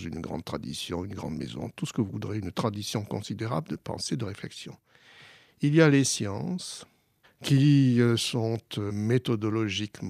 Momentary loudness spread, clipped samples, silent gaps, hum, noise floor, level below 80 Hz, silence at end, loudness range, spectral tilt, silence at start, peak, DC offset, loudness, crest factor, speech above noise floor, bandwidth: 15 LU; under 0.1%; none; none; -62 dBFS; -60 dBFS; 0 s; 8 LU; -5.5 dB/octave; 0 s; -8 dBFS; under 0.1%; -28 LUFS; 20 dB; 34 dB; 15 kHz